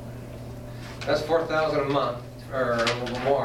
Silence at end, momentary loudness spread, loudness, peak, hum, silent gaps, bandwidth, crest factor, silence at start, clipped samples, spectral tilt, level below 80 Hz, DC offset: 0 s; 15 LU; -26 LUFS; -10 dBFS; none; none; 16.5 kHz; 18 dB; 0 s; under 0.1%; -5.5 dB/octave; -48 dBFS; under 0.1%